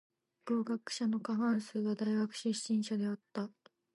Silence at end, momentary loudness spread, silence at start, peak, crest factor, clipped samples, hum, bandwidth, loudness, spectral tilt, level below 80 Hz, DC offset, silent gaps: 0.5 s; 8 LU; 0.45 s; -22 dBFS; 12 dB; under 0.1%; none; 11.5 kHz; -36 LUFS; -5 dB/octave; -88 dBFS; under 0.1%; none